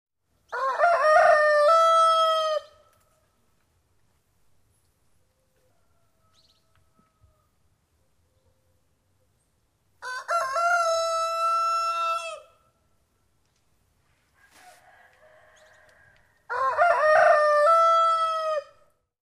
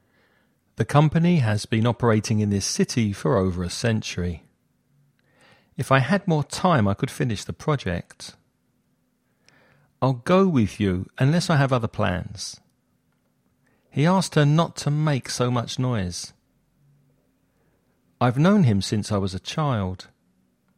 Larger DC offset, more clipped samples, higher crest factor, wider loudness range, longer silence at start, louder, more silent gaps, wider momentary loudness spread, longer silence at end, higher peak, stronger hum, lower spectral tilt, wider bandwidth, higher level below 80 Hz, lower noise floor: neither; neither; about the same, 18 dB vs 22 dB; first, 15 LU vs 5 LU; second, 0.5 s vs 0.8 s; about the same, -21 LUFS vs -23 LUFS; neither; about the same, 14 LU vs 12 LU; about the same, 0.65 s vs 0.75 s; second, -8 dBFS vs -2 dBFS; neither; second, 0 dB/octave vs -6 dB/octave; about the same, 14 kHz vs 14 kHz; second, -72 dBFS vs -52 dBFS; about the same, -70 dBFS vs -68 dBFS